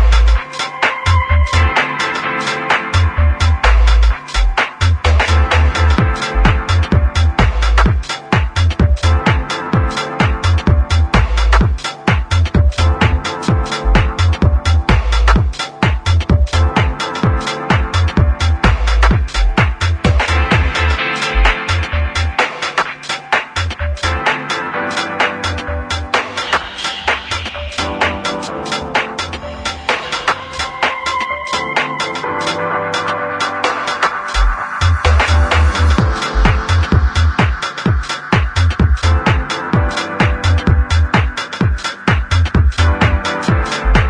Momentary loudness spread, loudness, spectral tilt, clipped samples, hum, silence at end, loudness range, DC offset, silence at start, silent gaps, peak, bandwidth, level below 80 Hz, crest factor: 6 LU; -15 LUFS; -5 dB/octave; under 0.1%; none; 0 s; 4 LU; under 0.1%; 0 s; none; 0 dBFS; 10.5 kHz; -18 dBFS; 14 dB